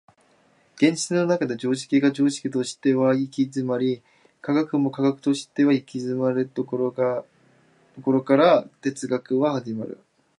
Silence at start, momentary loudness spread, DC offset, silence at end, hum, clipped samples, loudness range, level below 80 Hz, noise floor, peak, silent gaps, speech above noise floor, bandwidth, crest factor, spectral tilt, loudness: 0.8 s; 10 LU; under 0.1%; 0.45 s; none; under 0.1%; 2 LU; -74 dBFS; -60 dBFS; -4 dBFS; none; 38 dB; 11 kHz; 18 dB; -6 dB/octave; -23 LUFS